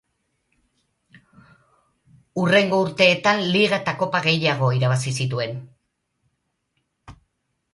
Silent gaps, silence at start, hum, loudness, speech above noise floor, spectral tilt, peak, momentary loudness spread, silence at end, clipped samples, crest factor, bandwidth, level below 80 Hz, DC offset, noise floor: none; 2.35 s; none; -20 LUFS; 54 dB; -5 dB/octave; -4 dBFS; 10 LU; 0.6 s; under 0.1%; 20 dB; 11.5 kHz; -60 dBFS; under 0.1%; -74 dBFS